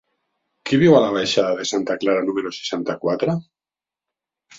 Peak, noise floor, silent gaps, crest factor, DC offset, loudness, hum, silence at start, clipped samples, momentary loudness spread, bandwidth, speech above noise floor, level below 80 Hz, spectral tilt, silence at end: -2 dBFS; under -90 dBFS; none; 18 dB; under 0.1%; -20 LUFS; none; 0.65 s; under 0.1%; 11 LU; 7.8 kHz; over 71 dB; -62 dBFS; -5.5 dB/octave; 1.15 s